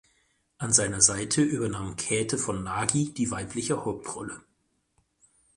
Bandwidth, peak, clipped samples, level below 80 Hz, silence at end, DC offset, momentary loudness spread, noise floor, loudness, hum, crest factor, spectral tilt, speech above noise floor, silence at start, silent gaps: 11.5 kHz; -4 dBFS; under 0.1%; -54 dBFS; 1.15 s; under 0.1%; 15 LU; -73 dBFS; -26 LUFS; none; 24 dB; -3.5 dB/octave; 45 dB; 0.6 s; none